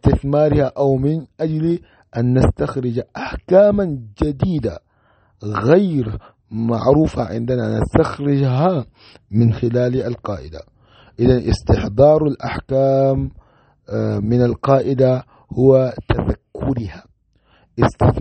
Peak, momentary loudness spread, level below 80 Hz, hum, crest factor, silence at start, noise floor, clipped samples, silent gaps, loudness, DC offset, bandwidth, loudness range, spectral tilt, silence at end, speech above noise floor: 0 dBFS; 14 LU; -34 dBFS; none; 16 dB; 0.05 s; -57 dBFS; under 0.1%; none; -18 LUFS; under 0.1%; 8.8 kHz; 2 LU; -9 dB/octave; 0 s; 41 dB